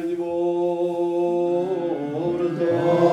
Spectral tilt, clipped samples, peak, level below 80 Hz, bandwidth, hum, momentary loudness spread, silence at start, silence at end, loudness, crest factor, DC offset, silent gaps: -8 dB/octave; under 0.1%; -6 dBFS; -66 dBFS; 8.4 kHz; none; 5 LU; 0 s; 0 s; -23 LUFS; 16 dB; under 0.1%; none